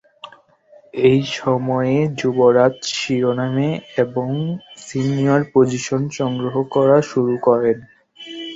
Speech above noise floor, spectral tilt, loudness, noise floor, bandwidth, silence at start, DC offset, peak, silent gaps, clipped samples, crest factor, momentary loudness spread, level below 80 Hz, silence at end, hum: 32 dB; -6 dB/octave; -18 LUFS; -50 dBFS; 8 kHz; 0.25 s; under 0.1%; -2 dBFS; none; under 0.1%; 16 dB; 11 LU; -56 dBFS; 0 s; none